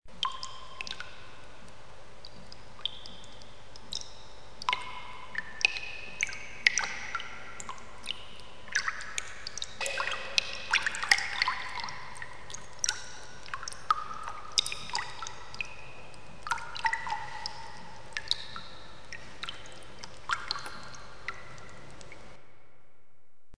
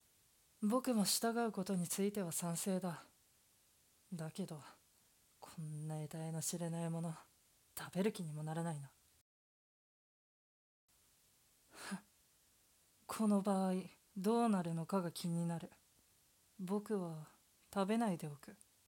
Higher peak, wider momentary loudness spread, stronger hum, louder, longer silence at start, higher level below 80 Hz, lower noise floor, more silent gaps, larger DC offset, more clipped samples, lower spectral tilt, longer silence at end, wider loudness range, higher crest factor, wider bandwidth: first, -2 dBFS vs -24 dBFS; first, 21 LU vs 18 LU; neither; first, -33 LUFS vs -40 LUFS; second, 0 s vs 0.6 s; first, -60 dBFS vs -84 dBFS; about the same, -71 dBFS vs -73 dBFS; second, none vs 9.21-10.88 s; first, 1% vs under 0.1%; neither; second, 0 dB/octave vs -5 dB/octave; second, 0 s vs 0.3 s; second, 10 LU vs 14 LU; first, 36 dB vs 20 dB; second, 11 kHz vs 17.5 kHz